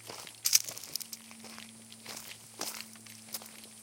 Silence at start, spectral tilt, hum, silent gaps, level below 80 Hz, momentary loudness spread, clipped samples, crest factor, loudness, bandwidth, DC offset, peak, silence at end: 0 s; 0.5 dB/octave; none; none; -82 dBFS; 21 LU; under 0.1%; 32 dB; -34 LUFS; 17 kHz; under 0.1%; -6 dBFS; 0 s